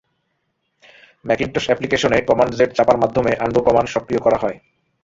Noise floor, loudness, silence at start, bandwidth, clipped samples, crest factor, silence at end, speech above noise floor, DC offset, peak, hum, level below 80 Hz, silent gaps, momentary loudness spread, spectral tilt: -71 dBFS; -17 LUFS; 1.25 s; 7.8 kHz; under 0.1%; 18 dB; 0.45 s; 54 dB; under 0.1%; -2 dBFS; none; -46 dBFS; none; 6 LU; -5.5 dB/octave